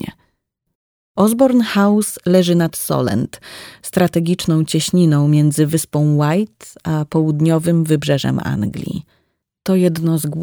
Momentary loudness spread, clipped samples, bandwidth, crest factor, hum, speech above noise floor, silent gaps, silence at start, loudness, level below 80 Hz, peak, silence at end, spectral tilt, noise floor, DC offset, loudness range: 14 LU; under 0.1%; over 20 kHz; 16 dB; none; 54 dB; 0.75-1.15 s; 0 s; -16 LUFS; -50 dBFS; 0 dBFS; 0 s; -6 dB/octave; -69 dBFS; under 0.1%; 2 LU